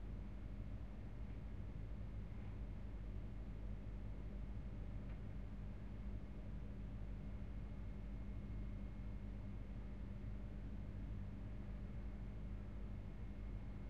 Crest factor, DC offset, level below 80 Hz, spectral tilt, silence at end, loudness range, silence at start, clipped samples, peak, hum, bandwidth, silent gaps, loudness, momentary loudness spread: 12 dB; 0.2%; -50 dBFS; -9 dB/octave; 0 s; 0 LU; 0 s; under 0.1%; -38 dBFS; 50 Hz at -60 dBFS; 5.4 kHz; none; -52 LUFS; 2 LU